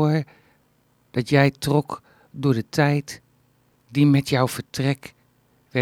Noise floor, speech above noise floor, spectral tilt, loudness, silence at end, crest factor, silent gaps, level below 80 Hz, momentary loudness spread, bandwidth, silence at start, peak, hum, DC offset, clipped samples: -63 dBFS; 42 dB; -6.5 dB/octave; -22 LUFS; 0 s; 20 dB; none; -58 dBFS; 18 LU; 16 kHz; 0 s; -2 dBFS; none; under 0.1%; under 0.1%